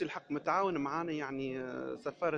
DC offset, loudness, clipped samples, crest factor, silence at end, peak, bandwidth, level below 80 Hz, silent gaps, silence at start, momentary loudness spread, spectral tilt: under 0.1%; -36 LUFS; under 0.1%; 18 dB; 0 s; -18 dBFS; 8 kHz; -70 dBFS; none; 0 s; 8 LU; -6.5 dB/octave